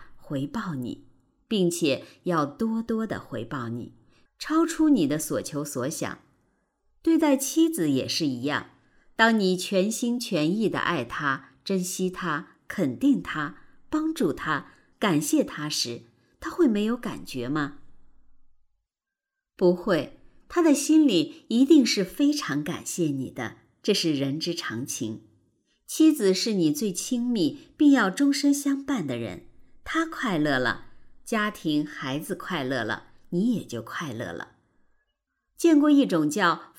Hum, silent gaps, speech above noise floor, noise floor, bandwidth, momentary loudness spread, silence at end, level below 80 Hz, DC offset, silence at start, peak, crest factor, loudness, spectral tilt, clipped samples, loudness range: none; none; 64 dB; -89 dBFS; 17 kHz; 14 LU; 0.15 s; -58 dBFS; under 0.1%; 0 s; -6 dBFS; 20 dB; -25 LUFS; -4.5 dB/octave; under 0.1%; 6 LU